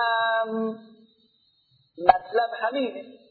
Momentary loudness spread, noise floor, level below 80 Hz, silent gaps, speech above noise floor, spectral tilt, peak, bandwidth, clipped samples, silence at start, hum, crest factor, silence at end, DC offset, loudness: 11 LU; -65 dBFS; -62 dBFS; none; 41 dB; -7 dB/octave; 0 dBFS; 4.7 kHz; under 0.1%; 0 s; none; 26 dB; 0.2 s; under 0.1%; -25 LUFS